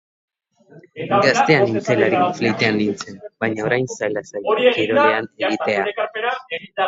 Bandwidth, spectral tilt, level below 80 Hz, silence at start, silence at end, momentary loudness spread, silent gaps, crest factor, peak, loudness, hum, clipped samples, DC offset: 7.8 kHz; -5 dB/octave; -62 dBFS; 0.75 s; 0 s; 10 LU; none; 18 dB; 0 dBFS; -18 LUFS; none; under 0.1%; under 0.1%